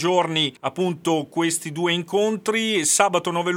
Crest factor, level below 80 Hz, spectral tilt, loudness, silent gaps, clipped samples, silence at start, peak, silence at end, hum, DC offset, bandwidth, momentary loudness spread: 22 dB; -70 dBFS; -3 dB/octave; -21 LUFS; none; under 0.1%; 0 s; 0 dBFS; 0 s; none; under 0.1%; 17 kHz; 6 LU